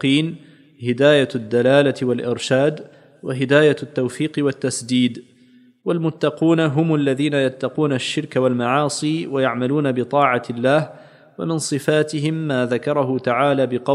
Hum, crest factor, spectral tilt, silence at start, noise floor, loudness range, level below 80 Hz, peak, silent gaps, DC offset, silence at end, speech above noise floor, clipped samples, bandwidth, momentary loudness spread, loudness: none; 18 dB; -5.5 dB/octave; 0 s; -51 dBFS; 2 LU; -68 dBFS; 0 dBFS; none; under 0.1%; 0 s; 33 dB; under 0.1%; 13 kHz; 9 LU; -19 LUFS